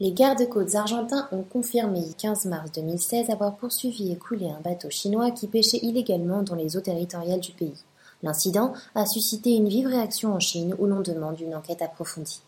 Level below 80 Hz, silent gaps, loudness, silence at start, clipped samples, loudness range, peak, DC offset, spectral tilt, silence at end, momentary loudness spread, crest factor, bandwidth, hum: -72 dBFS; none; -26 LUFS; 0 s; under 0.1%; 3 LU; -6 dBFS; under 0.1%; -4 dB/octave; 0.1 s; 10 LU; 20 dB; 17 kHz; none